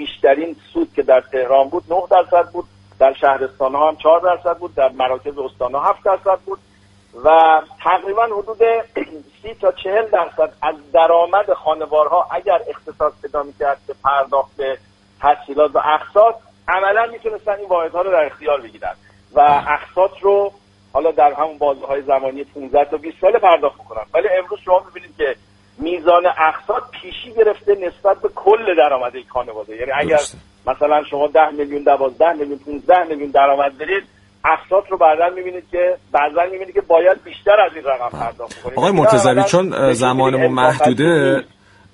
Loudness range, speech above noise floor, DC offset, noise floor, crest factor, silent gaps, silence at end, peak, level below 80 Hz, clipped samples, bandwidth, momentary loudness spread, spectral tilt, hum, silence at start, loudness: 3 LU; 35 dB; under 0.1%; -50 dBFS; 16 dB; none; 0.5 s; 0 dBFS; -50 dBFS; under 0.1%; 11.5 kHz; 11 LU; -5 dB/octave; none; 0 s; -16 LUFS